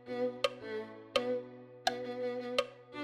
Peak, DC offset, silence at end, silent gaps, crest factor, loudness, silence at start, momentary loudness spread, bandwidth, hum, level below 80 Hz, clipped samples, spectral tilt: -16 dBFS; under 0.1%; 0 s; none; 22 dB; -37 LUFS; 0 s; 8 LU; 15.5 kHz; none; -72 dBFS; under 0.1%; -3.5 dB/octave